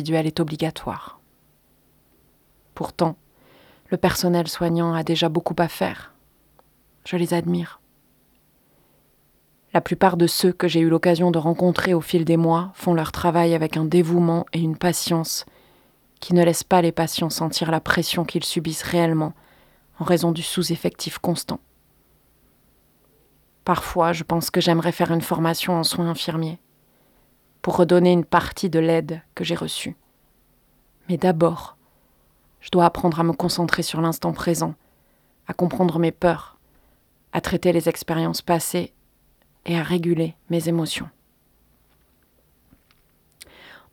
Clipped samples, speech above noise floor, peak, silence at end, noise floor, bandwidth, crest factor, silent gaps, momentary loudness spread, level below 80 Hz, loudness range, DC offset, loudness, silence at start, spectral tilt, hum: under 0.1%; 40 dB; 0 dBFS; 0.2 s; -61 dBFS; 18 kHz; 22 dB; none; 11 LU; -52 dBFS; 8 LU; under 0.1%; -21 LUFS; 0 s; -5.5 dB/octave; none